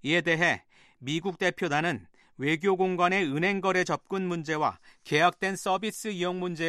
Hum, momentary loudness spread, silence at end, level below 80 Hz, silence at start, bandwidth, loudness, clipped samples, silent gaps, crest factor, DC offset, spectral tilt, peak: none; 8 LU; 0 s; -70 dBFS; 0.05 s; 13.5 kHz; -27 LUFS; under 0.1%; none; 20 dB; under 0.1%; -4.5 dB/octave; -8 dBFS